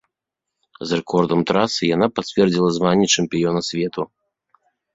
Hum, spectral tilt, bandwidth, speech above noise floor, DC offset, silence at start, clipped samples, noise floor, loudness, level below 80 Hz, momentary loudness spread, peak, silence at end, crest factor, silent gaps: none; -4.5 dB/octave; 8 kHz; 64 dB; under 0.1%; 0.8 s; under 0.1%; -83 dBFS; -19 LUFS; -54 dBFS; 8 LU; -2 dBFS; 0.9 s; 18 dB; none